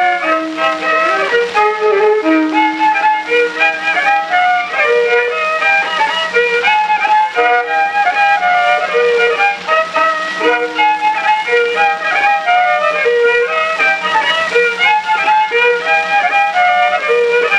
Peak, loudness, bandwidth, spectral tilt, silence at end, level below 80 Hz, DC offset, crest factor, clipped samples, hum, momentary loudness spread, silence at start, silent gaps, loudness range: 0 dBFS; -12 LUFS; 10 kHz; -2.5 dB/octave; 0 s; -60 dBFS; under 0.1%; 12 dB; under 0.1%; none; 2 LU; 0 s; none; 1 LU